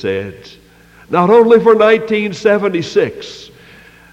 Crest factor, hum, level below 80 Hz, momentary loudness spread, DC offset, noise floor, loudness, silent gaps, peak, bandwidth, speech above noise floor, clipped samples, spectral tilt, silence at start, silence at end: 14 dB; none; -52 dBFS; 21 LU; under 0.1%; -41 dBFS; -12 LUFS; none; 0 dBFS; 8 kHz; 29 dB; under 0.1%; -6 dB/octave; 0 s; 0.65 s